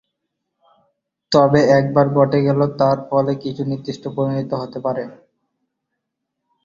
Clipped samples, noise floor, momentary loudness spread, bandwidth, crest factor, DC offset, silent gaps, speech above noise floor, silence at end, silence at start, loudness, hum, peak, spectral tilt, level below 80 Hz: under 0.1%; -78 dBFS; 11 LU; 7.6 kHz; 18 dB; under 0.1%; none; 61 dB; 1.5 s; 1.3 s; -18 LUFS; none; 0 dBFS; -7.5 dB/octave; -56 dBFS